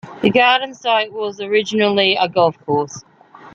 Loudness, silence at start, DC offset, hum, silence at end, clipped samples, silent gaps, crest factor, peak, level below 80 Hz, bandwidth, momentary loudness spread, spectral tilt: -16 LUFS; 0.05 s; under 0.1%; none; 0.05 s; under 0.1%; none; 16 dB; -2 dBFS; -60 dBFS; 7.6 kHz; 10 LU; -4.5 dB/octave